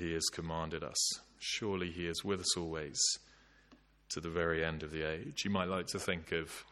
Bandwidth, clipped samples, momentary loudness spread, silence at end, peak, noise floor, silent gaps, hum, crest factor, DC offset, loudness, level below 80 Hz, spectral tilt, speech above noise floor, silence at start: 15.5 kHz; under 0.1%; 7 LU; 0 s; -18 dBFS; -65 dBFS; none; none; 20 dB; under 0.1%; -36 LUFS; -58 dBFS; -3 dB/octave; 28 dB; 0 s